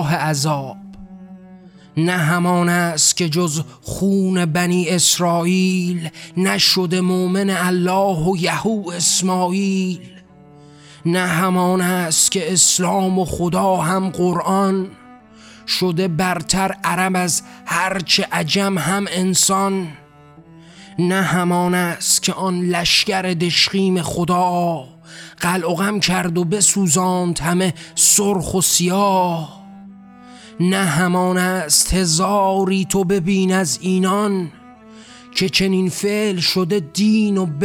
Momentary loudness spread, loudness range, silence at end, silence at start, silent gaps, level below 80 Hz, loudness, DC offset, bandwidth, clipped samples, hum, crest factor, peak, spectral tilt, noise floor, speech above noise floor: 8 LU; 3 LU; 0 s; 0 s; none; -44 dBFS; -17 LUFS; under 0.1%; 17.5 kHz; under 0.1%; none; 16 dB; -4 dBFS; -3.5 dB/octave; -45 dBFS; 27 dB